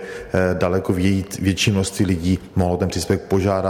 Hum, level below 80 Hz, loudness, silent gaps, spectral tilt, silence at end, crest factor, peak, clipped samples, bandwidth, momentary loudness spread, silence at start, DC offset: none; -42 dBFS; -20 LUFS; none; -5.5 dB/octave; 0 s; 14 dB; -6 dBFS; under 0.1%; 16.5 kHz; 3 LU; 0 s; under 0.1%